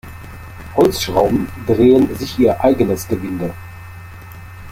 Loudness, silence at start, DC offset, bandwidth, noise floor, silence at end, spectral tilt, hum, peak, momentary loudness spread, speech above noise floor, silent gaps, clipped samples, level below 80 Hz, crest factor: -16 LUFS; 0.05 s; under 0.1%; 16.5 kHz; -34 dBFS; 0 s; -6 dB/octave; none; -2 dBFS; 23 LU; 20 dB; none; under 0.1%; -38 dBFS; 16 dB